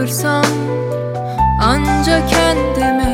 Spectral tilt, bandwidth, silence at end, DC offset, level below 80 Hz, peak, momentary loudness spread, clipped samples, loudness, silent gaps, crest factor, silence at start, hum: -5 dB/octave; 17 kHz; 0 s; under 0.1%; -24 dBFS; 0 dBFS; 7 LU; under 0.1%; -15 LUFS; none; 14 dB; 0 s; none